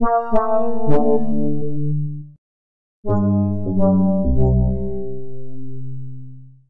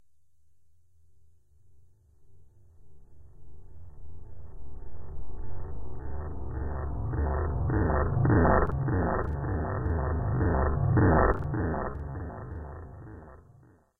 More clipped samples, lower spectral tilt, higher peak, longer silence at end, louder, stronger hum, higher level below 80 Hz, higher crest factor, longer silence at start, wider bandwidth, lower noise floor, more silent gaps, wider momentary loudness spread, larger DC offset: neither; about the same, -12.5 dB/octave vs -12.5 dB/octave; first, -4 dBFS vs -10 dBFS; second, 0 s vs 0.65 s; first, -20 LUFS vs -28 LUFS; neither; first, -30 dBFS vs -36 dBFS; second, 14 dB vs 20 dB; second, 0 s vs 2.25 s; first, 3.2 kHz vs 2.1 kHz; second, -38 dBFS vs -72 dBFS; first, 2.38-3.03 s vs none; second, 18 LU vs 24 LU; first, 7% vs under 0.1%